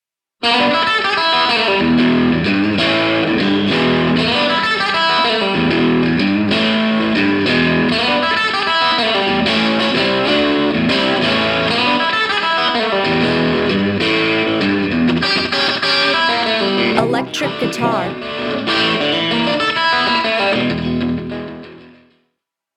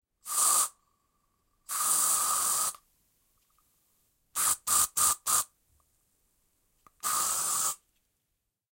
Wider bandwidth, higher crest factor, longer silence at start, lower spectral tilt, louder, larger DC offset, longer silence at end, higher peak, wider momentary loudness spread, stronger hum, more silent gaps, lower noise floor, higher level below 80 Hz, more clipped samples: second, 11.5 kHz vs 16.5 kHz; second, 14 dB vs 22 dB; first, 0.4 s vs 0.25 s; first, -5 dB/octave vs 2 dB/octave; first, -14 LUFS vs -26 LUFS; neither; second, 0.85 s vs 1 s; first, 0 dBFS vs -10 dBFS; second, 5 LU vs 10 LU; neither; neither; second, -74 dBFS vs -82 dBFS; first, -46 dBFS vs -68 dBFS; neither